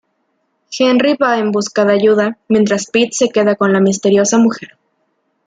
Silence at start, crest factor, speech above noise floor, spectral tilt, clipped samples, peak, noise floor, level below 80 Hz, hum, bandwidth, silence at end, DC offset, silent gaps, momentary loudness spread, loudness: 0.7 s; 12 dB; 53 dB; -4.5 dB/octave; under 0.1%; -2 dBFS; -65 dBFS; -60 dBFS; none; 9.4 kHz; 0.8 s; under 0.1%; none; 4 LU; -13 LUFS